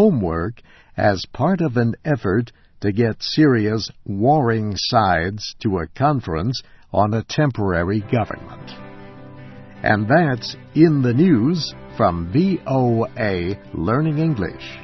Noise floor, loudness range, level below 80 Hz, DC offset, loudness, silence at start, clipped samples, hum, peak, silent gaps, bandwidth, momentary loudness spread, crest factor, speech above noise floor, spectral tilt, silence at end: -38 dBFS; 4 LU; -44 dBFS; under 0.1%; -20 LUFS; 0 s; under 0.1%; none; -2 dBFS; none; 6.2 kHz; 13 LU; 18 dB; 20 dB; -7 dB/octave; 0 s